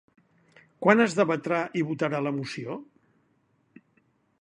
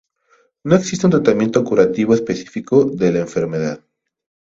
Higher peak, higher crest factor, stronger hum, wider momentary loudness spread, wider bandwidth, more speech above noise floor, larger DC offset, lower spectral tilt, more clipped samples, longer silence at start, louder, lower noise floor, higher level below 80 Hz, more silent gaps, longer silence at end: about the same, -2 dBFS vs 0 dBFS; first, 26 dB vs 18 dB; neither; first, 15 LU vs 10 LU; first, 11 kHz vs 7.8 kHz; about the same, 43 dB vs 43 dB; neither; about the same, -6 dB/octave vs -6.5 dB/octave; neither; first, 0.8 s vs 0.65 s; second, -26 LUFS vs -17 LUFS; first, -69 dBFS vs -58 dBFS; second, -74 dBFS vs -52 dBFS; neither; first, 1.55 s vs 0.75 s